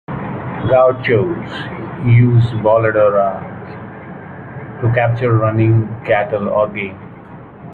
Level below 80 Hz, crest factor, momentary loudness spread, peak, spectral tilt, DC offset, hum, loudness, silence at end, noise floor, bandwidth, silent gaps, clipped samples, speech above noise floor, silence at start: -44 dBFS; 14 dB; 20 LU; -2 dBFS; -10 dB/octave; under 0.1%; none; -15 LUFS; 0 s; -35 dBFS; 4.3 kHz; none; under 0.1%; 22 dB; 0.1 s